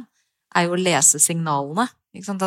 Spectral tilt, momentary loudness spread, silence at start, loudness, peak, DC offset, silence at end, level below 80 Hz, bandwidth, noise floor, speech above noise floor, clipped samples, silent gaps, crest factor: -3 dB/octave; 14 LU; 0 s; -18 LUFS; -2 dBFS; under 0.1%; 0 s; -70 dBFS; 17 kHz; -58 dBFS; 38 dB; under 0.1%; none; 20 dB